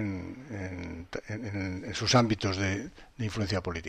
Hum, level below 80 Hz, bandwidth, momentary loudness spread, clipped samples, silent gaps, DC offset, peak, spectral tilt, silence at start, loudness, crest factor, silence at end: none; -54 dBFS; 12.5 kHz; 15 LU; under 0.1%; none; under 0.1%; -10 dBFS; -5 dB/octave; 0 s; -31 LUFS; 20 dB; 0 s